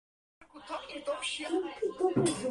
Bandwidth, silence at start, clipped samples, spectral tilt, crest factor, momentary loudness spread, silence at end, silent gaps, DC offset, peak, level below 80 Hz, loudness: 11.5 kHz; 0.4 s; under 0.1%; -4.5 dB/octave; 18 dB; 13 LU; 0 s; none; under 0.1%; -16 dBFS; -66 dBFS; -33 LUFS